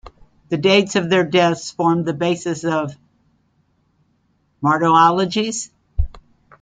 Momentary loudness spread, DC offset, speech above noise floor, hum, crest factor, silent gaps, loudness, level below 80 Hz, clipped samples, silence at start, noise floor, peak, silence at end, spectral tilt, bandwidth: 14 LU; under 0.1%; 46 dB; none; 18 dB; none; -18 LUFS; -36 dBFS; under 0.1%; 0.05 s; -63 dBFS; 0 dBFS; 0.4 s; -5 dB/octave; 9.6 kHz